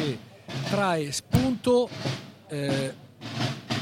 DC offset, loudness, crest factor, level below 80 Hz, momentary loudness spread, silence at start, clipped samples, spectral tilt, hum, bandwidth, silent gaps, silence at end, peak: under 0.1%; -28 LUFS; 20 dB; -50 dBFS; 14 LU; 0 s; under 0.1%; -5.5 dB/octave; none; 16.5 kHz; none; 0 s; -8 dBFS